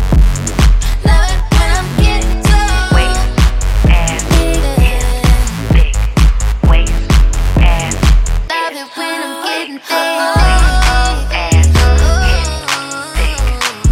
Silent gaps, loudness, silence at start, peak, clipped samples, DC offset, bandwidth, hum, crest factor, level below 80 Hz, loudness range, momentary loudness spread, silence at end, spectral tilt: none; -13 LUFS; 0 s; 0 dBFS; under 0.1%; under 0.1%; 15.5 kHz; none; 10 dB; -12 dBFS; 2 LU; 6 LU; 0 s; -4.5 dB/octave